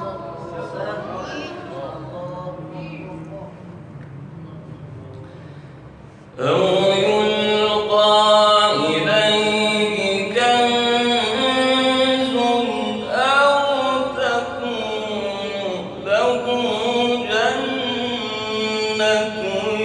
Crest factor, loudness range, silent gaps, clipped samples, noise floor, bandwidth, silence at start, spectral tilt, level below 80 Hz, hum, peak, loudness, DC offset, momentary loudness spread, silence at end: 16 dB; 18 LU; none; under 0.1%; -41 dBFS; 11.5 kHz; 0 s; -4 dB/octave; -54 dBFS; none; -2 dBFS; -18 LUFS; under 0.1%; 22 LU; 0 s